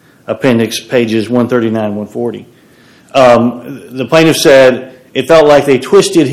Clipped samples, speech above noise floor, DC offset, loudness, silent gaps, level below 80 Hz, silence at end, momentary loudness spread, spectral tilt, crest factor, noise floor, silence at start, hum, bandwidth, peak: 4%; 34 dB; under 0.1%; -9 LUFS; none; -44 dBFS; 0 s; 15 LU; -5 dB/octave; 10 dB; -43 dBFS; 0.3 s; none; 15.5 kHz; 0 dBFS